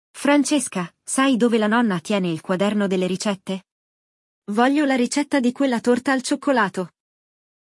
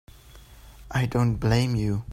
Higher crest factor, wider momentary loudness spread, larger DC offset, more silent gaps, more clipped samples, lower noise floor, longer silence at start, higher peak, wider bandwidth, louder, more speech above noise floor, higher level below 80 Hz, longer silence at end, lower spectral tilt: about the same, 16 dB vs 18 dB; first, 10 LU vs 5 LU; neither; first, 3.72-4.42 s vs none; neither; first, under -90 dBFS vs -48 dBFS; second, 0.15 s vs 0.35 s; first, -4 dBFS vs -8 dBFS; second, 12 kHz vs 15 kHz; first, -20 LUFS vs -25 LUFS; first, over 70 dB vs 25 dB; second, -72 dBFS vs -42 dBFS; first, 0.8 s vs 0 s; second, -4.5 dB/octave vs -7 dB/octave